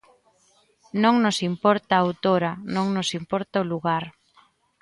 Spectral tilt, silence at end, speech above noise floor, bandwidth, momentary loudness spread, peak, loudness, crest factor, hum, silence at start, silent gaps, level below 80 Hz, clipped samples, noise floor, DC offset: -5.5 dB/octave; 0.7 s; 40 dB; 11.5 kHz; 8 LU; -4 dBFS; -23 LUFS; 20 dB; none; 0.95 s; none; -64 dBFS; under 0.1%; -62 dBFS; under 0.1%